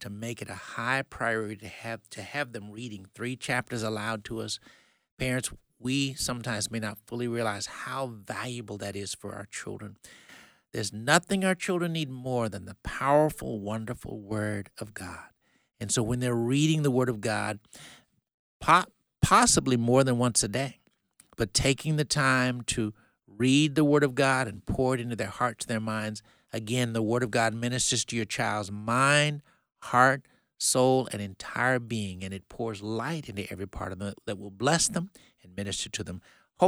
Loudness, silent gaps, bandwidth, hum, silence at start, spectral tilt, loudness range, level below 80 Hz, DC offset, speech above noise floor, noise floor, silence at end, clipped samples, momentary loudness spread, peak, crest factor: -28 LUFS; 5.11-5.17 s, 18.34-18.60 s; 16.5 kHz; none; 0 s; -4 dB/octave; 8 LU; -54 dBFS; under 0.1%; 35 dB; -64 dBFS; 0 s; under 0.1%; 16 LU; -6 dBFS; 24 dB